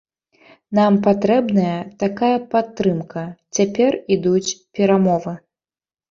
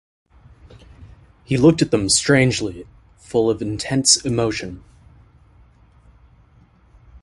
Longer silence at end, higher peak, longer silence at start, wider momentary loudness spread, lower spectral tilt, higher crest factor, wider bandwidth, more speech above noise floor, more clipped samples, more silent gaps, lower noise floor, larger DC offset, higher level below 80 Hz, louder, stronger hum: first, 0.75 s vs 0.05 s; about the same, -2 dBFS vs 0 dBFS; second, 0.7 s vs 1 s; second, 10 LU vs 15 LU; first, -6 dB/octave vs -4 dB/octave; second, 16 dB vs 22 dB; second, 7.6 kHz vs 11.5 kHz; first, over 72 dB vs 35 dB; neither; neither; first, under -90 dBFS vs -52 dBFS; neither; second, -58 dBFS vs -46 dBFS; about the same, -18 LUFS vs -18 LUFS; neither